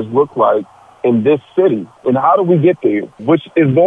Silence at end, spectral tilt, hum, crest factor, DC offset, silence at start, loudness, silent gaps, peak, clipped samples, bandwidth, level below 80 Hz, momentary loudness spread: 0 s; -10 dB/octave; none; 12 dB; under 0.1%; 0 s; -14 LUFS; none; -2 dBFS; under 0.1%; 3.8 kHz; -60 dBFS; 7 LU